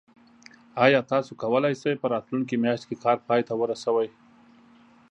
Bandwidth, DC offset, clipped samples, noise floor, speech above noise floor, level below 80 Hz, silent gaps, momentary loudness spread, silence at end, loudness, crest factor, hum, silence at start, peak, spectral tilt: 9.8 kHz; under 0.1%; under 0.1%; -55 dBFS; 31 dB; -74 dBFS; none; 7 LU; 1.05 s; -25 LUFS; 22 dB; none; 0.75 s; -4 dBFS; -6 dB/octave